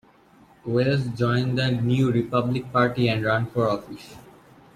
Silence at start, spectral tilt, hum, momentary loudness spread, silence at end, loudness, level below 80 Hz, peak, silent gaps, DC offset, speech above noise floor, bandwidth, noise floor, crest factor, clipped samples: 0.65 s; -7.5 dB/octave; none; 12 LU; 0.55 s; -23 LUFS; -54 dBFS; -8 dBFS; none; under 0.1%; 31 dB; 12.5 kHz; -54 dBFS; 16 dB; under 0.1%